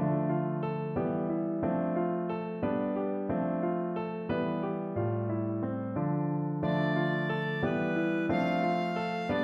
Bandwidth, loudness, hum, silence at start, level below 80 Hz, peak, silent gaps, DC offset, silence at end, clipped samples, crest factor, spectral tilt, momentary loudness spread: 7.4 kHz; -31 LUFS; none; 0 s; -62 dBFS; -16 dBFS; none; under 0.1%; 0 s; under 0.1%; 14 dB; -9 dB/octave; 4 LU